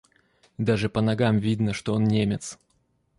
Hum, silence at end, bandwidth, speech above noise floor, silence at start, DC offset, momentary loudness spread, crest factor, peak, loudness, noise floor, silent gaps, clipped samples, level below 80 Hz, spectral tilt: none; 0.65 s; 11.5 kHz; 45 dB; 0.6 s; under 0.1%; 7 LU; 16 dB; -10 dBFS; -24 LUFS; -69 dBFS; none; under 0.1%; -52 dBFS; -6.5 dB/octave